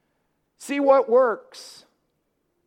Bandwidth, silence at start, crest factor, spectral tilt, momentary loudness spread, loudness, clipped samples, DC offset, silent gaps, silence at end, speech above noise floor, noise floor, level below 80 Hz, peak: 13 kHz; 0.6 s; 18 dB; -3.5 dB/octave; 24 LU; -20 LUFS; under 0.1%; under 0.1%; none; 1.05 s; 53 dB; -73 dBFS; -80 dBFS; -6 dBFS